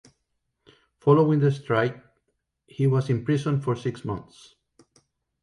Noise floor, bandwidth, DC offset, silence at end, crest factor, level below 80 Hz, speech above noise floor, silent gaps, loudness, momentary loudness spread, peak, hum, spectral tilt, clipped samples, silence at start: -77 dBFS; 11 kHz; under 0.1%; 1.2 s; 20 dB; -60 dBFS; 54 dB; none; -24 LUFS; 14 LU; -6 dBFS; none; -8.5 dB/octave; under 0.1%; 1.05 s